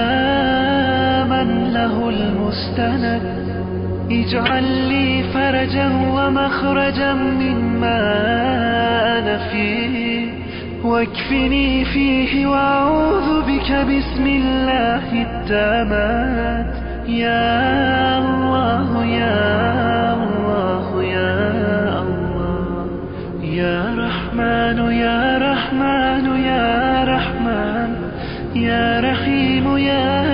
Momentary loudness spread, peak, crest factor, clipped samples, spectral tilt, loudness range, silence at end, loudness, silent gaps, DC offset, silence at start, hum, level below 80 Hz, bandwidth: 6 LU; -6 dBFS; 12 dB; under 0.1%; -4 dB/octave; 3 LU; 0 s; -18 LUFS; none; 0.4%; 0 s; none; -32 dBFS; 5.4 kHz